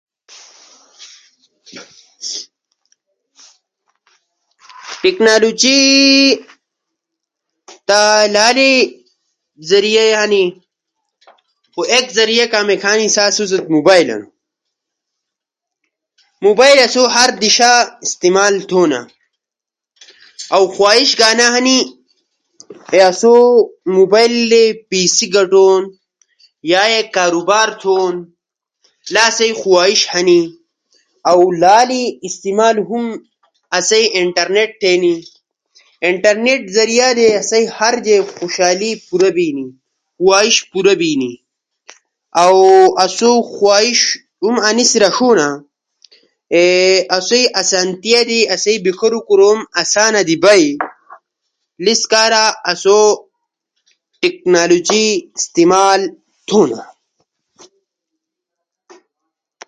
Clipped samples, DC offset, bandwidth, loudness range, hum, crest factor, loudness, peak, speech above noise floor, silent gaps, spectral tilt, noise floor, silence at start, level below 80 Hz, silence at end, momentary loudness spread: under 0.1%; under 0.1%; 11.5 kHz; 5 LU; none; 14 dB; -11 LUFS; 0 dBFS; 74 dB; none; -2 dB/octave; -85 dBFS; 1 s; -62 dBFS; 2.85 s; 11 LU